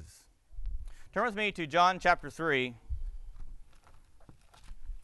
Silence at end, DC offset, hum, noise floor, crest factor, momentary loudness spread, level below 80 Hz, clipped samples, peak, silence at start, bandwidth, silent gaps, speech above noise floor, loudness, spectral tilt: 0 s; under 0.1%; none; -56 dBFS; 22 dB; 23 LU; -46 dBFS; under 0.1%; -12 dBFS; 0 s; 12 kHz; none; 27 dB; -30 LUFS; -4.5 dB/octave